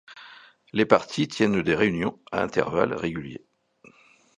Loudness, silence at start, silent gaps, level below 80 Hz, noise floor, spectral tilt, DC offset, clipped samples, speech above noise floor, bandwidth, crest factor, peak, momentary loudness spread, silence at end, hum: -24 LUFS; 0.1 s; none; -56 dBFS; -56 dBFS; -6 dB/octave; under 0.1%; under 0.1%; 32 dB; 10.5 kHz; 26 dB; 0 dBFS; 19 LU; 1 s; none